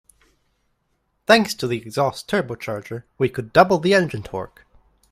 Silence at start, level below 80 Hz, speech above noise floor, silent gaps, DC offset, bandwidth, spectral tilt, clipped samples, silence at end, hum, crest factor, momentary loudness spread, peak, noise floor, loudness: 1.3 s; -54 dBFS; 50 dB; none; under 0.1%; 16 kHz; -5 dB/octave; under 0.1%; 0.65 s; none; 22 dB; 16 LU; 0 dBFS; -70 dBFS; -20 LUFS